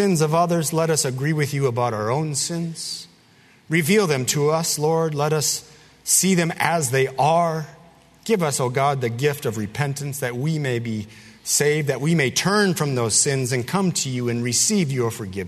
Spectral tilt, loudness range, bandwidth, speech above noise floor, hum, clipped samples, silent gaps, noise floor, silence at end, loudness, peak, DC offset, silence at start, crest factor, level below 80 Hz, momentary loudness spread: -4 dB/octave; 4 LU; 13.5 kHz; 32 dB; none; under 0.1%; none; -53 dBFS; 0 s; -21 LUFS; -2 dBFS; under 0.1%; 0 s; 20 dB; -60 dBFS; 9 LU